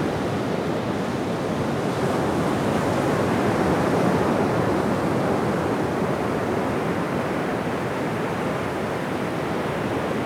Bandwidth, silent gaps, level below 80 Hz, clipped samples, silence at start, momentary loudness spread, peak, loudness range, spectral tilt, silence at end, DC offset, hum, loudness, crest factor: 18 kHz; none; -48 dBFS; under 0.1%; 0 s; 5 LU; -8 dBFS; 3 LU; -6.5 dB/octave; 0 s; under 0.1%; none; -24 LUFS; 14 dB